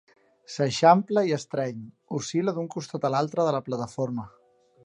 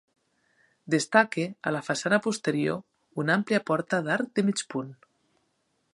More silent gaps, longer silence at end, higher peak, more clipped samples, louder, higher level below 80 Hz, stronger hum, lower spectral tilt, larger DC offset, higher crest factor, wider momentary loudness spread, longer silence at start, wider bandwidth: neither; second, 0.55 s vs 1 s; about the same, -6 dBFS vs -4 dBFS; neither; about the same, -26 LUFS vs -27 LUFS; first, -68 dBFS vs -74 dBFS; neither; about the same, -5.5 dB/octave vs -5 dB/octave; neither; about the same, 22 dB vs 24 dB; first, 15 LU vs 11 LU; second, 0.5 s vs 0.85 s; about the same, 11 kHz vs 11.5 kHz